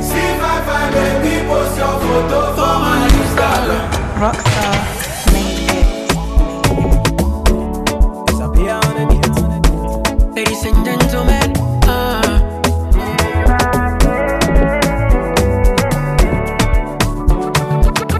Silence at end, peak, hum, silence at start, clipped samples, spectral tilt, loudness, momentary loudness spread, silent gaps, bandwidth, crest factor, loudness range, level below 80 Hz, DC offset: 0 s; -2 dBFS; none; 0 s; under 0.1%; -5 dB/octave; -15 LUFS; 3 LU; none; 14 kHz; 12 dB; 1 LU; -16 dBFS; 0.5%